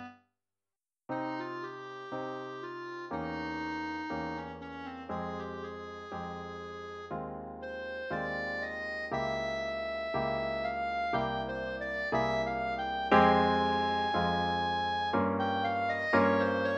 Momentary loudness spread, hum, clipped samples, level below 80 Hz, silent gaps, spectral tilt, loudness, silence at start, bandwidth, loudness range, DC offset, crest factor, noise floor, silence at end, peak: 15 LU; none; under 0.1%; -56 dBFS; none; -6 dB/octave; -33 LUFS; 0 s; 8.4 kHz; 11 LU; under 0.1%; 22 dB; under -90 dBFS; 0 s; -12 dBFS